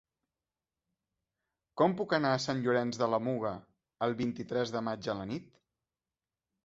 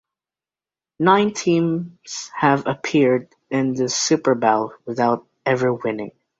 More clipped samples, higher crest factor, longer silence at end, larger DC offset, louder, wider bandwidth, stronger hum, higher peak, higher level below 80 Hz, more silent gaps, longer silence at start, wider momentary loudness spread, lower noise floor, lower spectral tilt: neither; about the same, 22 dB vs 20 dB; first, 1.25 s vs 0.3 s; neither; second, -33 LUFS vs -20 LUFS; about the same, 8 kHz vs 7.8 kHz; neither; second, -12 dBFS vs -2 dBFS; second, -70 dBFS vs -62 dBFS; neither; first, 1.75 s vs 1 s; about the same, 10 LU vs 10 LU; about the same, under -90 dBFS vs under -90 dBFS; first, -6 dB/octave vs -4.5 dB/octave